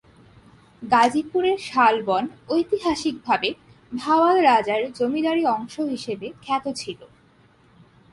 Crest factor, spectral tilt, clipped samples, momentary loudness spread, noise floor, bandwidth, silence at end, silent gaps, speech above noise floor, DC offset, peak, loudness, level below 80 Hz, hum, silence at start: 18 dB; -4 dB/octave; under 0.1%; 14 LU; -56 dBFS; 11.5 kHz; 1.05 s; none; 34 dB; under 0.1%; -6 dBFS; -22 LUFS; -60 dBFS; none; 0.8 s